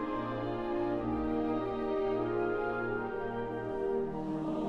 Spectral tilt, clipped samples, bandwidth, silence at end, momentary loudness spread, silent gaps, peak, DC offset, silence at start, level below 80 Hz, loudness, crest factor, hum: -8.5 dB/octave; under 0.1%; 6.8 kHz; 0 s; 4 LU; none; -22 dBFS; under 0.1%; 0 s; -52 dBFS; -34 LUFS; 12 dB; none